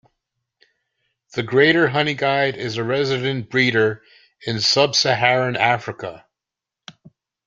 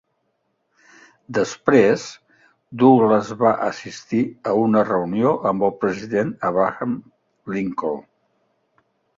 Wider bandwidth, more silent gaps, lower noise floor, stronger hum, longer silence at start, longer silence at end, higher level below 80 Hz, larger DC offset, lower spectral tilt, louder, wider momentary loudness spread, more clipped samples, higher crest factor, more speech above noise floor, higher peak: about the same, 7.6 kHz vs 7.6 kHz; neither; first, -86 dBFS vs -71 dBFS; neither; about the same, 1.35 s vs 1.3 s; first, 1.3 s vs 1.15 s; about the same, -60 dBFS vs -60 dBFS; neither; second, -4 dB/octave vs -6.5 dB/octave; about the same, -18 LUFS vs -20 LUFS; about the same, 15 LU vs 13 LU; neither; about the same, 20 dB vs 20 dB; first, 67 dB vs 52 dB; about the same, -2 dBFS vs 0 dBFS